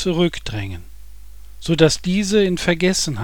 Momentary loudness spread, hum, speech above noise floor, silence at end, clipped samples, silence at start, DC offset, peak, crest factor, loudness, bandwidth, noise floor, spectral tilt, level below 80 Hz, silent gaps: 15 LU; none; 22 dB; 0 s; under 0.1%; 0 s; 2%; 0 dBFS; 18 dB; -18 LUFS; 18.5 kHz; -41 dBFS; -4.5 dB/octave; -38 dBFS; none